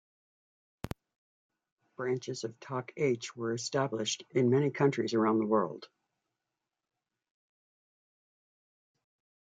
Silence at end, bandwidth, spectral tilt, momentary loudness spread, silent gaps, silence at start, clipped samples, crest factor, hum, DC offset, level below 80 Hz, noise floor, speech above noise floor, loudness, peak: 3.6 s; 9.8 kHz; -5.5 dB/octave; 17 LU; 1.16-1.50 s, 1.72-1.77 s; 0.85 s; under 0.1%; 20 dB; none; under 0.1%; -68 dBFS; -89 dBFS; 58 dB; -32 LUFS; -14 dBFS